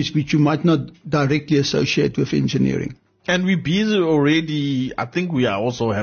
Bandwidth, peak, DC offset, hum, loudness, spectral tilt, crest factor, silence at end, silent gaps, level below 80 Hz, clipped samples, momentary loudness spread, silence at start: 6.8 kHz; -6 dBFS; under 0.1%; none; -19 LUFS; -6 dB/octave; 12 dB; 0 s; none; -50 dBFS; under 0.1%; 7 LU; 0 s